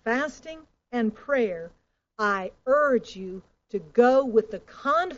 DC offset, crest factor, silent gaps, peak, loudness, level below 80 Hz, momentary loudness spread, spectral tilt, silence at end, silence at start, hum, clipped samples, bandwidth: under 0.1%; 18 dB; none; -6 dBFS; -25 LUFS; -60 dBFS; 20 LU; -3.5 dB/octave; 0 s; 0.05 s; none; under 0.1%; 7.6 kHz